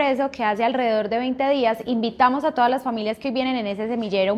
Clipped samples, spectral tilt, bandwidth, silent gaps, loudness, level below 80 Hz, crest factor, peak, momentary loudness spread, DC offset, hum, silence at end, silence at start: under 0.1%; -6 dB/octave; 14 kHz; none; -22 LUFS; -60 dBFS; 18 dB; -4 dBFS; 6 LU; under 0.1%; none; 0 s; 0 s